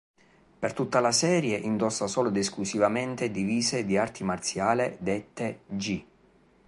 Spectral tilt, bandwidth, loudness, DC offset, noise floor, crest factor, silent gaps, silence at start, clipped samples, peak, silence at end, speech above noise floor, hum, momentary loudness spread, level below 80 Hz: -4 dB/octave; 11.5 kHz; -28 LUFS; under 0.1%; -61 dBFS; 20 dB; none; 0.6 s; under 0.1%; -8 dBFS; 0.65 s; 34 dB; none; 10 LU; -60 dBFS